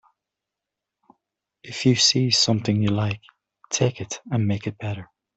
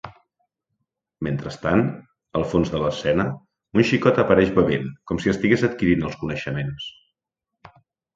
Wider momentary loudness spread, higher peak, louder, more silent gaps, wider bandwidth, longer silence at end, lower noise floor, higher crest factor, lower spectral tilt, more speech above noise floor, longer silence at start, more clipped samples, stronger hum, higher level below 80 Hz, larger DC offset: first, 16 LU vs 13 LU; about the same, -4 dBFS vs -2 dBFS; about the same, -22 LUFS vs -22 LUFS; neither; about the same, 8.4 kHz vs 7.8 kHz; second, 0.35 s vs 1.25 s; about the same, -86 dBFS vs -84 dBFS; about the same, 20 dB vs 22 dB; second, -4 dB/octave vs -7 dB/octave; about the same, 64 dB vs 63 dB; first, 1.65 s vs 0.05 s; neither; neither; second, -60 dBFS vs -46 dBFS; neither